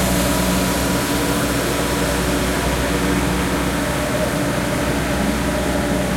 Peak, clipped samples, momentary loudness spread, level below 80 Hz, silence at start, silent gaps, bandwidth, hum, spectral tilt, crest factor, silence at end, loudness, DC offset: -6 dBFS; under 0.1%; 2 LU; -28 dBFS; 0 s; none; 16.5 kHz; none; -4.5 dB/octave; 14 dB; 0 s; -19 LUFS; under 0.1%